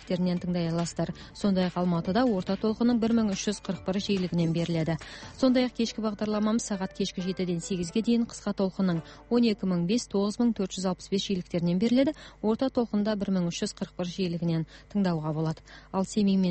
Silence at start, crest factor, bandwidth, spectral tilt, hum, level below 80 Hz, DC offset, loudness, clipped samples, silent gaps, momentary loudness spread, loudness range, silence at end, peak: 0 s; 14 dB; 8.8 kHz; -6 dB/octave; none; -54 dBFS; under 0.1%; -28 LUFS; under 0.1%; none; 7 LU; 2 LU; 0 s; -12 dBFS